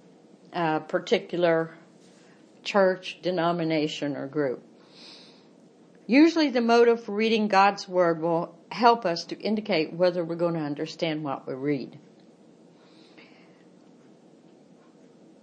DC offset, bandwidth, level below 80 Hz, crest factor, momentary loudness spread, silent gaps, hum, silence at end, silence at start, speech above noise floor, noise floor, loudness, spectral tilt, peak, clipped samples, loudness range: under 0.1%; 8.8 kHz; -82 dBFS; 22 dB; 13 LU; none; none; 3.45 s; 0.5 s; 30 dB; -55 dBFS; -25 LUFS; -6 dB/octave; -4 dBFS; under 0.1%; 11 LU